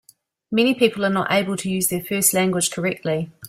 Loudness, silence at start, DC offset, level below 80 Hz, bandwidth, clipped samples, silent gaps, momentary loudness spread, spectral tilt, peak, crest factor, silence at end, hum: -20 LUFS; 0.5 s; under 0.1%; -60 dBFS; 16 kHz; under 0.1%; none; 7 LU; -3.5 dB/octave; -2 dBFS; 18 dB; 0 s; none